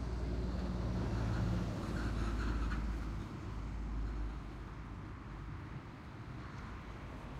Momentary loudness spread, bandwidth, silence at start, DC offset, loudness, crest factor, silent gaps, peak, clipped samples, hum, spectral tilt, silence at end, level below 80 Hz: 11 LU; 10 kHz; 0 s; under 0.1%; -42 LUFS; 14 dB; none; -26 dBFS; under 0.1%; none; -7 dB/octave; 0 s; -42 dBFS